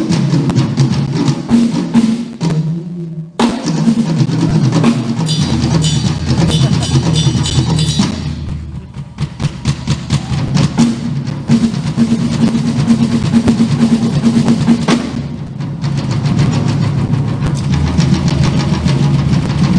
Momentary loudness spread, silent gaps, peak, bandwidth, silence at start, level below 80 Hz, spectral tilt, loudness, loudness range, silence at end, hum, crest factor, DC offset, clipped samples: 8 LU; none; 0 dBFS; 10.5 kHz; 0 s; -30 dBFS; -6 dB/octave; -14 LUFS; 3 LU; 0 s; none; 12 dB; under 0.1%; under 0.1%